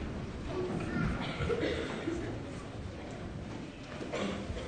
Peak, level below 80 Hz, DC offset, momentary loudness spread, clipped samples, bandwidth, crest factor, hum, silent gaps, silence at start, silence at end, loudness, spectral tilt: -20 dBFS; -46 dBFS; under 0.1%; 10 LU; under 0.1%; 9.6 kHz; 18 dB; none; none; 0 s; 0 s; -37 LUFS; -6 dB/octave